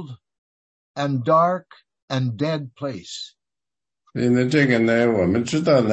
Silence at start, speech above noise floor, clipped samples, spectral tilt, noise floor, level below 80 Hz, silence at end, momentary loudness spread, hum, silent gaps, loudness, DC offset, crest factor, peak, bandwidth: 0 s; over 70 dB; under 0.1%; -6.5 dB/octave; under -90 dBFS; -58 dBFS; 0 s; 16 LU; none; 0.38-0.95 s, 2.02-2.08 s; -21 LUFS; under 0.1%; 18 dB; -4 dBFS; 8.6 kHz